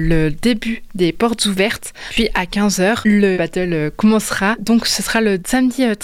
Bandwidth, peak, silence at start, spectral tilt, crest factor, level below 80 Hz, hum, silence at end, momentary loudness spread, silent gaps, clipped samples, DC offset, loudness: 16 kHz; -4 dBFS; 0 s; -4.5 dB/octave; 12 dB; -32 dBFS; none; 0 s; 5 LU; none; under 0.1%; under 0.1%; -16 LUFS